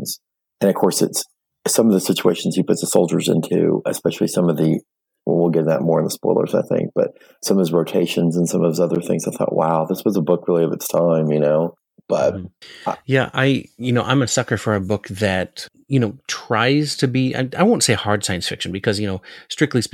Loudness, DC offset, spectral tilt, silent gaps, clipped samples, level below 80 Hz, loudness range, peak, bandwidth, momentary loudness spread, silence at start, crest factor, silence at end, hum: -19 LUFS; under 0.1%; -5 dB/octave; none; under 0.1%; -60 dBFS; 2 LU; 0 dBFS; 19 kHz; 8 LU; 0 s; 18 dB; 0.05 s; none